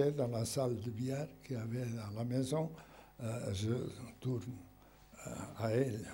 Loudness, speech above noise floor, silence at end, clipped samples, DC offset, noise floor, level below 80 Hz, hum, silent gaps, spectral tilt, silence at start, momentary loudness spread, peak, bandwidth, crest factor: -39 LUFS; 23 dB; 0 s; under 0.1%; under 0.1%; -61 dBFS; -66 dBFS; none; none; -6.5 dB/octave; 0 s; 13 LU; -20 dBFS; 16 kHz; 20 dB